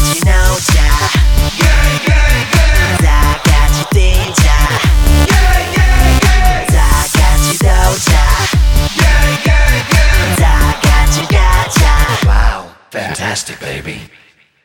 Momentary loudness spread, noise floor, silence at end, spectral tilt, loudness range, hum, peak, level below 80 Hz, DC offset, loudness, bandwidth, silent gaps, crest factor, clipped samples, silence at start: 7 LU; -46 dBFS; 0.6 s; -4 dB/octave; 2 LU; none; 0 dBFS; -10 dBFS; under 0.1%; -11 LUFS; 19 kHz; none; 10 dB; under 0.1%; 0 s